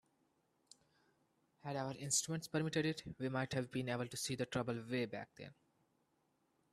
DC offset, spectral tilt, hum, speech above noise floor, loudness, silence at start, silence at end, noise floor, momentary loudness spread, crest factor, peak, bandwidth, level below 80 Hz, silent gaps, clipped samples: under 0.1%; -4 dB/octave; none; 39 dB; -41 LUFS; 1.65 s; 1.2 s; -80 dBFS; 13 LU; 22 dB; -22 dBFS; 15 kHz; -74 dBFS; none; under 0.1%